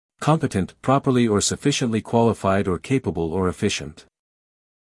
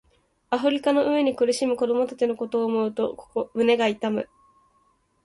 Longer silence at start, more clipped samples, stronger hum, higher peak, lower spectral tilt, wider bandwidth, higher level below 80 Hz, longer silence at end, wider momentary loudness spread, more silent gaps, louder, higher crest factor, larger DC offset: second, 0.2 s vs 0.5 s; neither; neither; first, -4 dBFS vs -8 dBFS; about the same, -5 dB/octave vs -4.5 dB/octave; about the same, 12 kHz vs 11.5 kHz; first, -52 dBFS vs -66 dBFS; about the same, 0.9 s vs 1 s; about the same, 6 LU vs 8 LU; neither; first, -21 LUFS vs -24 LUFS; about the same, 18 dB vs 16 dB; neither